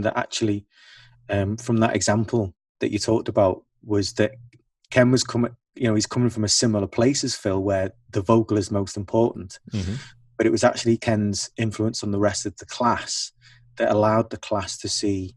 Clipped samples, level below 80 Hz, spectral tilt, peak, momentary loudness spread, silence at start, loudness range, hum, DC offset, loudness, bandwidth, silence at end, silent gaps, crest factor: under 0.1%; -56 dBFS; -5 dB/octave; -4 dBFS; 10 LU; 0 s; 2 LU; none; under 0.1%; -23 LUFS; 12 kHz; 0.05 s; 2.69-2.75 s; 20 dB